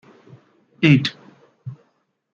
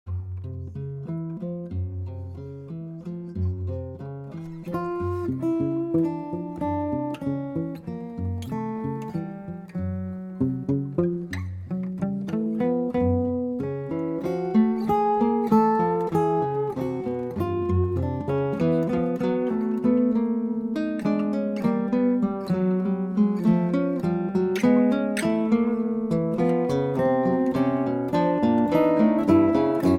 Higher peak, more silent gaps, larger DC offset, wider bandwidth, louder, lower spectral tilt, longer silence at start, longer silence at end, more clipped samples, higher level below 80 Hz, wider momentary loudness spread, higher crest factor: first, -2 dBFS vs -8 dBFS; neither; neither; second, 7.2 kHz vs 14.5 kHz; first, -18 LUFS vs -25 LUFS; second, -7 dB/octave vs -8.5 dB/octave; first, 0.8 s vs 0.05 s; first, 0.6 s vs 0 s; neither; second, -62 dBFS vs -52 dBFS; first, 23 LU vs 13 LU; first, 22 dB vs 16 dB